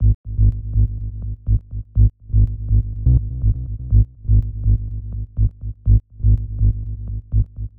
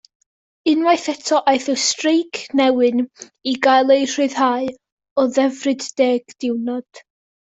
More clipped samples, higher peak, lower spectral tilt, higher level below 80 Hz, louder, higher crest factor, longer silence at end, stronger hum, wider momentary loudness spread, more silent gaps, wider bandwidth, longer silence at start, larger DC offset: neither; about the same, -4 dBFS vs -2 dBFS; first, -15 dB/octave vs -2 dB/octave; first, -20 dBFS vs -66 dBFS; second, -21 LUFS vs -18 LUFS; about the same, 14 dB vs 16 dB; second, 0 s vs 0.6 s; neither; about the same, 10 LU vs 9 LU; about the same, 0.15-0.24 s vs 4.92-4.97 s, 5.11-5.16 s; second, 0.8 kHz vs 8.4 kHz; second, 0 s vs 0.65 s; first, 1% vs under 0.1%